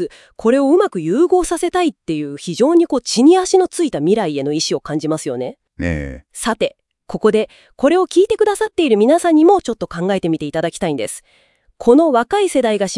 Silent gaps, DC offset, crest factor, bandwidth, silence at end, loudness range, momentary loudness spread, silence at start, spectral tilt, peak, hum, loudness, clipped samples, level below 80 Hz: none; under 0.1%; 16 dB; 12 kHz; 0 s; 5 LU; 12 LU; 0 s; -5 dB/octave; 0 dBFS; none; -16 LUFS; under 0.1%; -44 dBFS